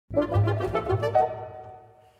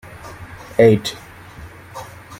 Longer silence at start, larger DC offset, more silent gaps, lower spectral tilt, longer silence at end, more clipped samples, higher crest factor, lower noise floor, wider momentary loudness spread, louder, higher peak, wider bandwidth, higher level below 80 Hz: second, 0.1 s vs 0.25 s; neither; neither; first, -8.5 dB/octave vs -6 dB/octave; first, 0.4 s vs 0.05 s; neither; about the same, 16 dB vs 20 dB; first, -49 dBFS vs -38 dBFS; second, 18 LU vs 25 LU; second, -25 LUFS vs -16 LUFS; second, -10 dBFS vs 0 dBFS; second, 7.2 kHz vs 16 kHz; about the same, -48 dBFS vs -48 dBFS